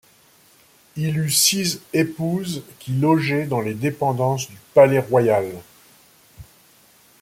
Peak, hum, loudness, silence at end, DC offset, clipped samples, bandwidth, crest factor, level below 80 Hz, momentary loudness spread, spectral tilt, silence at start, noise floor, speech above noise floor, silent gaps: -2 dBFS; none; -20 LUFS; 0.8 s; under 0.1%; under 0.1%; 16.5 kHz; 20 dB; -58 dBFS; 12 LU; -4.5 dB/octave; 0.95 s; -54 dBFS; 34 dB; none